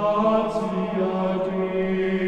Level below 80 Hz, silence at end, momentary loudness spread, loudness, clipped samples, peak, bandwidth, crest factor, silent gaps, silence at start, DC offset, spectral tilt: -52 dBFS; 0 s; 5 LU; -23 LUFS; under 0.1%; -8 dBFS; 8.8 kHz; 14 dB; none; 0 s; under 0.1%; -8 dB/octave